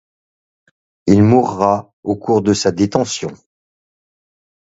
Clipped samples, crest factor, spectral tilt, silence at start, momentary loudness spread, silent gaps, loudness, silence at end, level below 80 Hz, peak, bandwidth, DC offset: under 0.1%; 18 dB; -6 dB/octave; 1.05 s; 12 LU; 1.93-2.03 s; -15 LUFS; 1.35 s; -46 dBFS; 0 dBFS; 8 kHz; under 0.1%